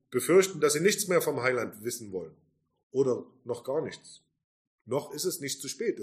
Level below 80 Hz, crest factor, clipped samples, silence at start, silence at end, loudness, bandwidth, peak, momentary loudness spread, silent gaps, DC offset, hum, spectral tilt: -76 dBFS; 18 dB; under 0.1%; 0.1 s; 0 s; -29 LUFS; 15.5 kHz; -12 dBFS; 15 LU; 2.83-2.90 s, 4.44-4.79 s; under 0.1%; none; -3.5 dB/octave